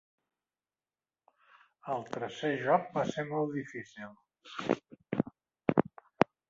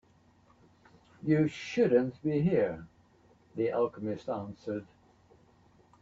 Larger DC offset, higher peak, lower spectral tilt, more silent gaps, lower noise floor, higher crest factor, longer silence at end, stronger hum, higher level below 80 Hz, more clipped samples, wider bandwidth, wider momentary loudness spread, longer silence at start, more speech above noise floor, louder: neither; first, -6 dBFS vs -14 dBFS; second, -5 dB/octave vs -8 dB/octave; neither; first, under -90 dBFS vs -64 dBFS; first, 30 dB vs 20 dB; second, 0.25 s vs 1.15 s; neither; second, -72 dBFS vs -66 dBFS; neither; about the same, 7.6 kHz vs 7.8 kHz; first, 17 LU vs 13 LU; first, 1.85 s vs 1.25 s; first, over 56 dB vs 34 dB; second, -34 LUFS vs -31 LUFS